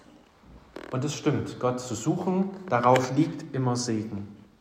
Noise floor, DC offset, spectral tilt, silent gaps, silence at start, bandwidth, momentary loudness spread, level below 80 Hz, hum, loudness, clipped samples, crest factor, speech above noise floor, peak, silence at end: -54 dBFS; under 0.1%; -6 dB/octave; none; 0.5 s; 15.5 kHz; 15 LU; -62 dBFS; none; -27 LUFS; under 0.1%; 20 dB; 28 dB; -8 dBFS; 0.15 s